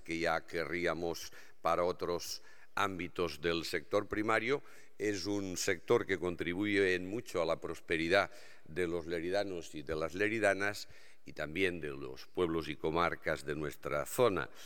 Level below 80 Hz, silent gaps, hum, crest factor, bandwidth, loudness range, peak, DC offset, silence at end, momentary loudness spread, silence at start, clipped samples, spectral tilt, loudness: -62 dBFS; none; none; 22 dB; 18 kHz; 3 LU; -12 dBFS; 0.4%; 0 s; 11 LU; 0.05 s; under 0.1%; -4.5 dB/octave; -35 LUFS